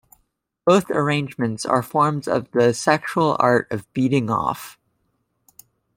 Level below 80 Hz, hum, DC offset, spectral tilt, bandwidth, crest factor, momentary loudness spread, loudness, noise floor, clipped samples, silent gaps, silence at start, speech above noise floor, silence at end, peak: -60 dBFS; none; under 0.1%; -6 dB/octave; 16.5 kHz; 20 dB; 8 LU; -20 LUFS; -70 dBFS; under 0.1%; none; 0.65 s; 50 dB; 1.25 s; -2 dBFS